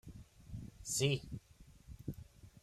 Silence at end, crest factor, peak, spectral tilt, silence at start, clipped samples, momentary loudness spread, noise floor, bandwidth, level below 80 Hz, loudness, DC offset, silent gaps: 0.05 s; 22 dB; -20 dBFS; -4 dB/octave; 0.05 s; under 0.1%; 23 LU; -60 dBFS; 15.5 kHz; -60 dBFS; -40 LUFS; under 0.1%; none